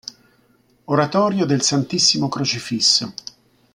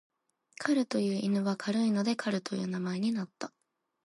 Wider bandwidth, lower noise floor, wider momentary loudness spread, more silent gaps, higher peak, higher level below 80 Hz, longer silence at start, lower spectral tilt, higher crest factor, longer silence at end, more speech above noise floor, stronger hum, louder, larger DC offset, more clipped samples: first, 13 kHz vs 11.5 kHz; about the same, -58 dBFS vs -58 dBFS; first, 17 LU vs 8 LU; neither; first, -2 dBFS vs -12 dBFS; first, -62 dBFS vs -80 dBFS; first, 0.9 s vs 0.6 s; second, -3.5 dB/octave vs -6 dB/octave; about the same, 18 dB vs 20 dB; about the same, 0.65 s vs 0.55 s; first, 40 dB vs 27 dB; neither; first, -17 LUFS vs -31 LUFS; neither; neither